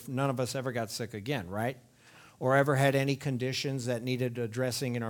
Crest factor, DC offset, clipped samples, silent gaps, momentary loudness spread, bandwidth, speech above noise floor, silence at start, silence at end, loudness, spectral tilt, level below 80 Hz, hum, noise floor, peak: 20 dB; under 0.1%; under 0.1%; none; 9 LU; 19 kHz; 26 dB; 0 s; 0 s; -31 LUFS; -5.5 dB/octave; -70 dBFS; none; -57 dBFS; -10 dBFS